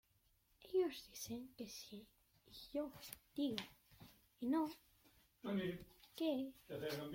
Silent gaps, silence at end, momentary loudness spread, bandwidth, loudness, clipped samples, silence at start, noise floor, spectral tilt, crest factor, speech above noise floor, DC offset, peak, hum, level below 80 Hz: none; 0 s; 20 LU; 16.5 kHz; -45 LUFS; under 0.1%; 0.6 s; -78 dBFS; -5 dB/octave; 24 dB; 32 dB; under 0.1%; -22 dBFS; none; -76 dBFS